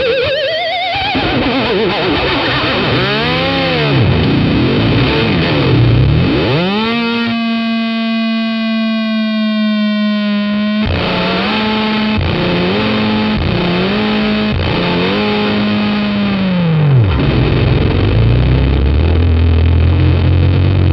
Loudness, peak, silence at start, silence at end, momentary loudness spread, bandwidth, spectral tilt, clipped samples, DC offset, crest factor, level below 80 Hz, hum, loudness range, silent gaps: -13 LUFS; 0 dBFS; 0 s; 0 s; 4 LU; 6 kHz; -8.5 dB/octave; under 0.1%; under 0.1%; 12 dB; -24 dBFS; none; 3 LU; none